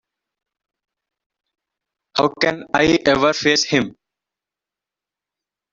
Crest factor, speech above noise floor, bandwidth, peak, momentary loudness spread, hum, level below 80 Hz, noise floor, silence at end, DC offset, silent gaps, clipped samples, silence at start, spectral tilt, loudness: 20 dB; 70 dB; 7.8 kHz; -2 dBFS; 6 LU; 50 Hz at -55 dBFS; -52 dBFS; -88 dBFS; 1.8 s; under 0.1%; none; under 0.1%; 2.15 s; -3.5 dB/octave; -17 LUFS